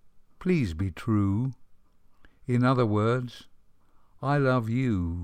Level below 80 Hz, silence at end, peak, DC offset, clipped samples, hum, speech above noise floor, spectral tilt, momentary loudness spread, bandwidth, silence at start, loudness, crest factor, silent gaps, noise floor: -54 dBFS; 0 s; -12 dBFS; under 0.1%; under 0.1%; none; 30 dB; -8.5 dB/octave; 10 LU; 9.6 kHz; 0.05 s; -27 LUFS; 16 dB; none; -56 dBFS